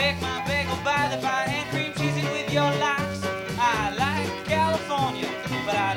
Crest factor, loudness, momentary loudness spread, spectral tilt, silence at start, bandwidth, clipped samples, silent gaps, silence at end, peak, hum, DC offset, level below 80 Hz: 16 dB; -25 LUFS; 5 LU; -4.5 dB/octave; 0 s; 19.5 kHz; under 0.1%; none; 0 s; -8 dBFS; none; under 0.1%; -48 dBFS